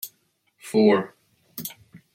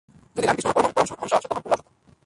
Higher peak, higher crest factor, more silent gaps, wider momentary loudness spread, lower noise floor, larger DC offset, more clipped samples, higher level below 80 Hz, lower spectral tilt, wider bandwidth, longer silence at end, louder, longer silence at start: about the same, -6 dBFS vs -4 dBFS; about the same, 20 dB vs 20 dB; neither; first, 21 LU vs 6 LU; first, -68 dBFS vs -47 dBFS; neither; neither; second, -72 dBFS vs -56 dBFS; first, -5.5 dB/octave vs -4 dB/octave; first, 16.5 kHz vs 11.5 kHz; second, 0.2 s vs 0.45 s; about the same, -21 LUFS vs -23 LUFS; second, 0.05 s vs 0.35 s